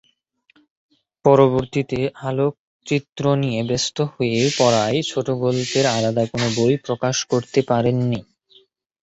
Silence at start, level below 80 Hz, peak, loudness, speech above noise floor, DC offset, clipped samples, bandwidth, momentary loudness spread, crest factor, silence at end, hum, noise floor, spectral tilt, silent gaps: 1.25 s; -52 dBFS; -2 dBFS; -20 LUFS; 43 dB; under 0.1%; under 0.1%; 8.2 kHz; 7 LU; 18 dB; 0.8 s; none; -62 dBFS; -5 dB/octave; 2.59-2.80 s